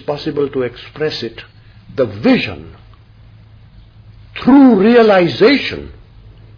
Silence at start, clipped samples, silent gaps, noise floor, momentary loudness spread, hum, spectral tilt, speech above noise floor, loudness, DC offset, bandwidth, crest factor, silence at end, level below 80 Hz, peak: 0.1 s; under 0.1%; none; -41 dBFS; 20 LU; none; -7.5 dB/octave; 29 dB; -13 LUFS; under 0.1%; 5.4 kHz; 14 dB; 0.65 s; -44 dBFS; 0 dBFS